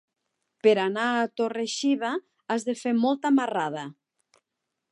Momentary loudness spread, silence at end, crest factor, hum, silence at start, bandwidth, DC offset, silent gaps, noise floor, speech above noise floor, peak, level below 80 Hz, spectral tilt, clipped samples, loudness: 9 LU; 1 s; 20 dB; none; 0.65 s; 11.5 kHz; under 0.1%; none; -83 dBFS; 59 dB; -8 dBFS; -84 dBFS; -4.5 dB/octave; under 0.1%; -26 LUFS